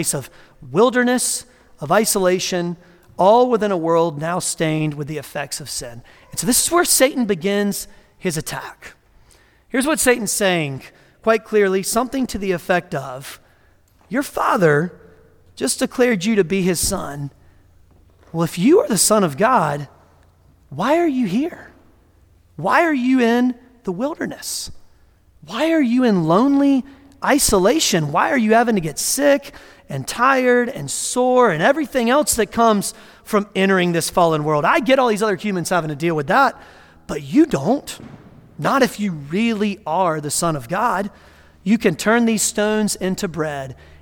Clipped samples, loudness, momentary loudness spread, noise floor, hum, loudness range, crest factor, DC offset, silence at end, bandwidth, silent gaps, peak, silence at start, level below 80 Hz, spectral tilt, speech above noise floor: under 0.1%; -18 LUFS; 13 LU; -54 dBFS; none; 4 LU; 18 dB; under 0.1%; 0.25 s; 18.5 kHz; none; -2 dBFS; 0 s; -48 dBFS; -4 dB/octave; 36 dB